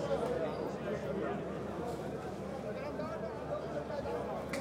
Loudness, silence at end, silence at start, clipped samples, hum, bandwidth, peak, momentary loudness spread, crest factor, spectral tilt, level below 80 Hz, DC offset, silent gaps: -39 LUFS; 0 s; 0 s; under 0.1%; none; 16 kHz; -22 dBFS; 5 LU; 16 dB; -6.5 dB/octave; -58 dBFS; under 0.1%; none